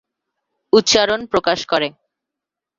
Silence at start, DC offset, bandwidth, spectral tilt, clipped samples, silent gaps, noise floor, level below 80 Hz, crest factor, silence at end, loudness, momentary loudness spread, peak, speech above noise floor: 0.75 s; under 0.1%; 7.6 kHz; -2.5 dB/octave; under 0.1%; none; -85 dBFS; -54 dBFS; 18 dB; 0.9 s; -16 LUFS; 7 LU; -2 dBFS; 68 dB